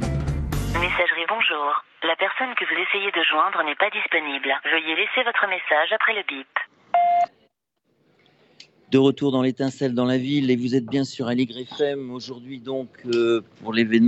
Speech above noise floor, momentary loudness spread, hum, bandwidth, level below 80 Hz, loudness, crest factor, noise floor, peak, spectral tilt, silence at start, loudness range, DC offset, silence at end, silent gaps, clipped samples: 49 dB; 8 LU; none; 14 kHz; -42 dBFS; -22 LUFS; 18 dB; -72 dBFS; -4 dBFS; -5.5 dB/octave; 0 s; 4 LU; under 0.1%; 0 s; none; under 0.1%